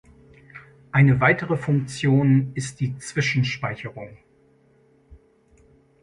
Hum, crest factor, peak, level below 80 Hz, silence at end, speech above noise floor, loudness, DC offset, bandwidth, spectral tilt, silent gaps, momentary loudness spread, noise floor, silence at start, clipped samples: none; 18 dB; -6 dBFS; -54 dBFS; 0.85 s; 38 dB; -21 LUFS; under 0.1%; 11 kHz; -6.5 dB/octave; none; 15 LU; -59 dBFS; 0.55 s; under 0.1%